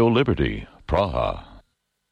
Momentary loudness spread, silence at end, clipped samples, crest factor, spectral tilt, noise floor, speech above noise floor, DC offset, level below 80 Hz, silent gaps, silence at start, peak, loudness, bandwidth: 13 LU; 0.55 s; under 0.1%; 16 dB; -8.5 dB/octave; -71 dBFS; 50 dB; under 0.1%; -36 dBFS; none; 0 s; -8 dBFS; -23 LUFS; 8.6 kHz